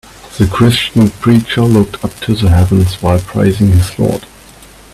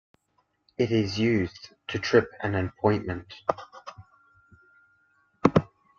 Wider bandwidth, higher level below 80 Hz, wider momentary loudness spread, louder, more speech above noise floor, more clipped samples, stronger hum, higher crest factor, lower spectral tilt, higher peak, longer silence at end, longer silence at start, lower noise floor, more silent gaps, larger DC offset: first, 14.5 kHz vs 7.4 kHz; first, -30 dBFS vs -58 dBFS; second, 7 LU vs 18 LU; first, -11 LUFS vs -27 LUFS; second, 27 dB vs 46 dB; neither; neither; second, 12 dB vs 26 dB; about the same, -6.5 dB/octave vs -6.5 dB/octave; about the same, 0 dBFS vs -2 dBFS; first, 0.7 s vs 0.35 s; second, 0.25 s vs 0.8 s; second, -37 dBFS vs -72 dBFS; neither; neither